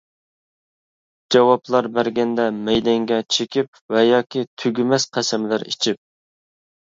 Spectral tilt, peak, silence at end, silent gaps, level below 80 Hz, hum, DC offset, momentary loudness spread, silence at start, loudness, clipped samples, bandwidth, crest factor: -4 dB/octave; -2 dBFS; 0.9 s; 3.68-3.73 s, 3.81-3.89 s, 4.47-4.57 s; -58 dBFS; none; under 0.1%; 7 LU; 1.3 s; -19 LUFS; under 0.1%; 7.8 kHz; 20 dB